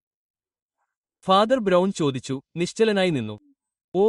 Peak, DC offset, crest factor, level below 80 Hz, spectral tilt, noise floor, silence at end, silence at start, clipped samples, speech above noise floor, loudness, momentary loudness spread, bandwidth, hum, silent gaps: -4 dBFS; under 0.1%; 18 dB; -64 dBFS; -5.5 dB/octave; -80 dBFS; 0 s; 1.25 s; under 0.1%; 58 dB; -22 LUFS; 14 LU; 11.5 kHz; none; 3.84-3.92 s